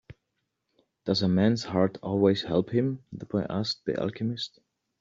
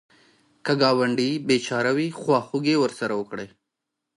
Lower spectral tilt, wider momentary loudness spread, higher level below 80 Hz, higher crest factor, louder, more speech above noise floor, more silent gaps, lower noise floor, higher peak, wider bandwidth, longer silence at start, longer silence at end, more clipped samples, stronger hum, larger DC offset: first, -7 dB/octave vs -5 dB/octave; second, 10 LU vs 13 LU; first, -64 dBFS vs -70 dBFS; about the same, 20 dB vs 20 dB; second, -27 LUFS vs -23 LUFS; second, 54 dB vs 60 dB; neither; about the same, -80 dBFS vs -83 dBFS; second, -10 dBFS vs -6 dBFS; second, 7.6 kHz vs 11.5 kHz; second, 0.1 s vs 0.65 s; second, 0.55 s vs 0.7 s; neither; neither; neither